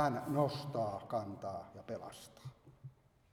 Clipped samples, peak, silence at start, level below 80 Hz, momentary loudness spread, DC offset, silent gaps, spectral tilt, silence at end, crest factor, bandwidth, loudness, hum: under 0.1%; -18 dBFS; 0 s; -72 dBFS; 22 LU; under 0.1%; none; -6.5 dB/octave; 0.4 s; 22 dB; 18.5 kHz; -40 LUFS; none